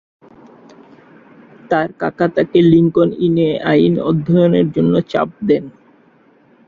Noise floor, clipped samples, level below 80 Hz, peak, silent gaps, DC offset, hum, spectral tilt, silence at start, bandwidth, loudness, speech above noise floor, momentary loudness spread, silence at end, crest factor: -51 dBFS; under 0.1%; -52 dBFS; 0 dBFS; none; under 0.1%; none; -9.5 dB/octave; 1.7 s; 6.8 kHz; -15 LUFS; 37 dB; 7 LU; 0.95 s; 16 dB